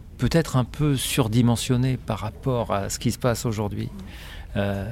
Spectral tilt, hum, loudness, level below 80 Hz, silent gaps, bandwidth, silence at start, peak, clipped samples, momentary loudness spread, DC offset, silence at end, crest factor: -5.5 dB/octave; none; -24 LUFS; -40 dBFS; none; 16.5 kHz; 0 s; -8 dBFS; under 0.1%; 11 LU; under 0.1%; 0 s; 16 dB